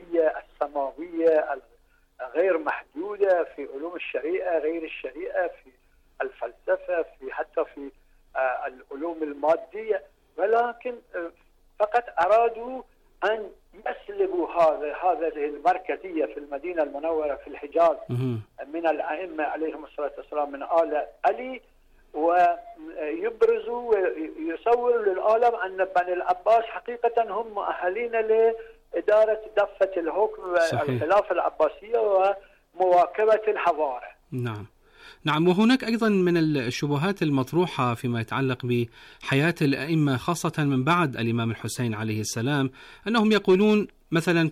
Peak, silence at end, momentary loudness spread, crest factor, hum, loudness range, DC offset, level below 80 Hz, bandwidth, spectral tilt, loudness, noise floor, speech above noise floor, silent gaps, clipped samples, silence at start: -12 dBFS; 0 s; 13 LU; 14 dB; none; 5 LU; under 0.1%; -60 dBFS; 15 kHz; -6 dB/octave; -25 LUFS; -61 dBFS; 36 dB; none; under 0.1%; 0 s